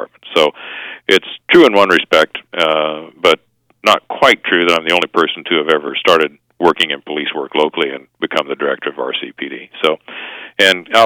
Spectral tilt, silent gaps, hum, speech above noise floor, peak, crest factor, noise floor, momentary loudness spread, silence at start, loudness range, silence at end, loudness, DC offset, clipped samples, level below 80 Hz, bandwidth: -3.5 dB/octave; none; none; 30 dB; 0 dBFS; 14 dB; -43 dBFS; 12 LU; 0 s; 6 LU; 0 s; -14 LUFS; under 0.1%; 0.3%; -58 dBFS; 19.5 kHz